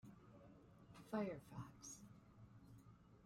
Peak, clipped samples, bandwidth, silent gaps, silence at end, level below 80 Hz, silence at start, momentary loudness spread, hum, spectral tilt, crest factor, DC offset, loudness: -32 dBFS; under 0.1%; 16 kHz; none; 0 s; -76 dBFS; 0.05 s; 19 LU; none; -5.5 dB/octave; 22 dB; under 0.1%; -52 LUFS